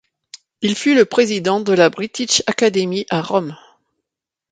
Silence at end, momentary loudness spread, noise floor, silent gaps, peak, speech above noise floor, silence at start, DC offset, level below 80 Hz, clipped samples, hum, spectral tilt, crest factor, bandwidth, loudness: 0.95 s; 8 LU; -85 dBFS; none; 0 dBFS; 69 dB; 0.35 s; under 0.1%; -62 dBFS; under 0.1%; none; -3.5 dB/octave; 18 dB; 9.6 kHz; -17 LUFS